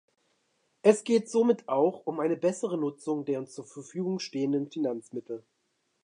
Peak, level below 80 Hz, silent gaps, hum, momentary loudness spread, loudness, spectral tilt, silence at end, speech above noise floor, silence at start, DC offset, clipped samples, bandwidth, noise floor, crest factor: -8 dBFS; -84 dBFS; none; none; 15 LU; -29 LUFS; -6 dB/octave; 0.65 s; 48 dB; 0.85 s; under 0.1%; under 0.1%; 11 kHz; -76 dBFS; 22 dB